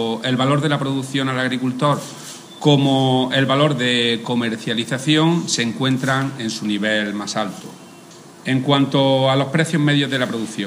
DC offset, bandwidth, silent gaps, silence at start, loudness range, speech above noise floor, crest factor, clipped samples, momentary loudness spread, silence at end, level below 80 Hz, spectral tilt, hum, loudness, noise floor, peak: under 0.1%; 15.5 kHz; none; 0 s; 4 LU; 23 dB; 16 dB; under 0.1%; 8 LU; 0 s; -66 dBFS; -5 dB/octave; none; -18 LUFS; -41 dBFS; -2 dBFS